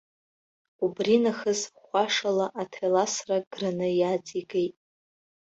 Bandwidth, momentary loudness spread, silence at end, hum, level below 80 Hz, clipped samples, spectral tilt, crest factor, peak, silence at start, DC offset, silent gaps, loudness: 8.2 kHz; 8 LU; 0.85 s; none; -72 dBFS; under 0.1%; -4 dB/octave; 18 dB; -10 dBFS; 0.8 s; under 0.1%; 3.47-3.51 s; -27 LUFS